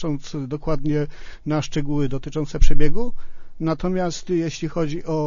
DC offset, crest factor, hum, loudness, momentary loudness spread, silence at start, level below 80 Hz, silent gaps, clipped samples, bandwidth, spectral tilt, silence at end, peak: under 0.1%; 16 dB; none; -25 LUFS; 6 LU; 0 s; -24 dBFS; none; under 0.1%; 7.4 kHz; -6.5 dB/octave; 0 s; 0 dBFS